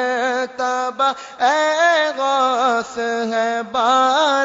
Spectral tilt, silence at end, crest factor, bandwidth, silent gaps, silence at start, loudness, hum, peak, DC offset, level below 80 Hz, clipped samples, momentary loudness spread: -1.5 dB/octave; 0 s; 14 dB; 7.8 kHz; none; 0 s; -18 LUFS; none; -4 dBFS; under 0.1%; -66 dBFS; under 0.1%; 6 LU